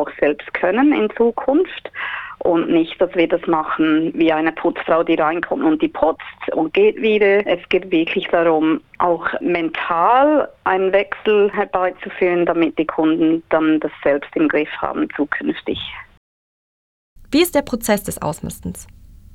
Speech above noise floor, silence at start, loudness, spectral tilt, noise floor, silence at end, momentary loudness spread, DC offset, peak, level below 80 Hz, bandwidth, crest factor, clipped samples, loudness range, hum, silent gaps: over 73 dB; 0 s; -18 LUFS; -5 dB/octave; under -90 dBFS; 0.5 s; 9 LU; under 0.1%; -2 dBFS; -50 dBFS; 15.5 kHz; 16 dB; under 0.1%; 5 LU; none; 16.17-17.16 s